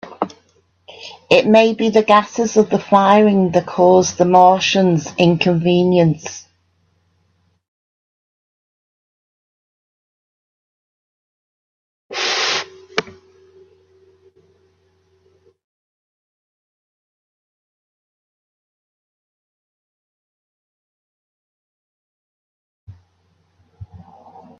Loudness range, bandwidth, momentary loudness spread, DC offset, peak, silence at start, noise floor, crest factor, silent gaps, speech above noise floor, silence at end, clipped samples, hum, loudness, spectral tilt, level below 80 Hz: 13 LU; 7.8 kHz; 16 LU; under 0.1%; 0 dBFS; 0.05 s; -62 dBFS; 20 dB; 7.68-12.09 s, 15.64-22.87 s; 49 dB; 0.65 s; under 0.1%; none; -14 LUFS; -5 dB/octave; -60 dBFS